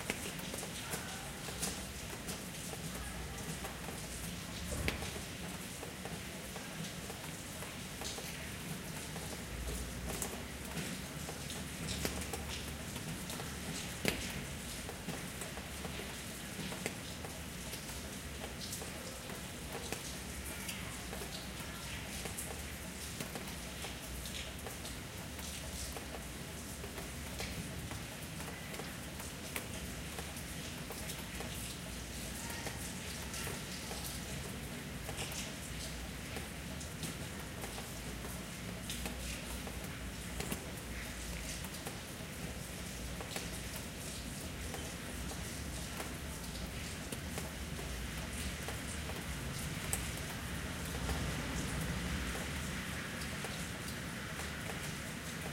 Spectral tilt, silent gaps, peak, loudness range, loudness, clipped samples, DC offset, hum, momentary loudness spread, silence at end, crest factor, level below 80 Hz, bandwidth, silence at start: -3.5 dB/octave; none; -12 dBFS; 3 LU; -42 LUFS; under 0.1%; under 0.1%; none; 5 LU; 0 s; 30 dB; -50 dBFS; 16 kHz; 0 s